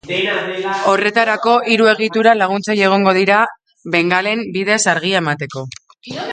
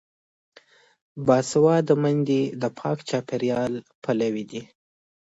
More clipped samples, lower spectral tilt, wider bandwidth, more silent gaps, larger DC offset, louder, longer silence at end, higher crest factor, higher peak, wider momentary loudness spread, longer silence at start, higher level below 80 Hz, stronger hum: neither; second, -4 dB/octave vs -6.5 dB/octave; first, 9.6 kHz vs 8 kHz; second, none vs 3.95-4.02 s; neither; first, -14 LUFS vs -23 LUFS; second, 0 s vs 0.65 s; about the same, 16 dB vs 20 dB; first, 0 dBFS vs -6 dBFS; about the same, 14 LU vs 13 LU; second, 0.05 s vs 1.15 s; about the same, -62 dBFS vs -66 dBFS; neither